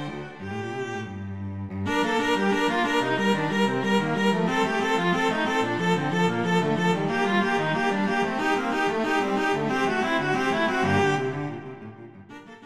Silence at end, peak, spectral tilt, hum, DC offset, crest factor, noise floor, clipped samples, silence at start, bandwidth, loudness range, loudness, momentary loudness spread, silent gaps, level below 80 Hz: 0 s; -10 dBFS; -5.5 dB/octave; none; 0.4%; 14 dB; -44 dBFS; under 0.1%; 0 s; 14 kHz; 2 LU; -24 LUFS; 11 LU; none; -58 dBFS